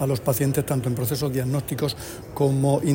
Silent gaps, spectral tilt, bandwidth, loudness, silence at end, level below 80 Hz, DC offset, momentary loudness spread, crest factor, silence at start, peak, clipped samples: none; -6 dB/octave; 16.5 kHz; -24 LUFS; 0 s; -48 dBFS; under 0.1%; 6 LU; 14 dB; 0 s; -8 dBFS; under 0.1%